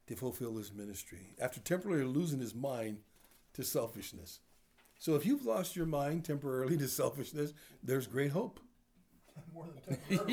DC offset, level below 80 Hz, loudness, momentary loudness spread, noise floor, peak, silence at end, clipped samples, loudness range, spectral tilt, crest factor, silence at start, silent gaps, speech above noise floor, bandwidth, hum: under 0.1%; -66 dBFS; -38 LUFS; 16 LU; -68 dBFS; -20 dBFS; 0 s; under 0.1%; 4 LU; -5.5 dB/octave; 18 dB; 0.1 s; none; 31 dB; over 20 kHz; none